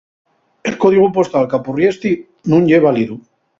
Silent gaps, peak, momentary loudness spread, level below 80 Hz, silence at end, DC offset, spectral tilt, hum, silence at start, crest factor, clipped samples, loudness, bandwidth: none; 0 dBFS; 12 LU; -54 dBFS; 0.4 s; under 0.1%; -7.5 dB/octave; none; 0.65 s; 14 dB; under 0.1%; -14 LUFS; 7.6 kHz